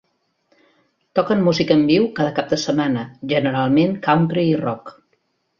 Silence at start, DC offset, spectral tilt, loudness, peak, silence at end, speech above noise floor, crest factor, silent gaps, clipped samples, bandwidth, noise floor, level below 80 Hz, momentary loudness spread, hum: 1.15 s; under 0.1%; -6.5 dB/octave; -18 LUFS; -2 dBFS; 0.7 s; 50 dB; 18 dB; none; under 0.1%; 7.4 kHz; -67 dBFS; -56 dBFS; 7 LU; none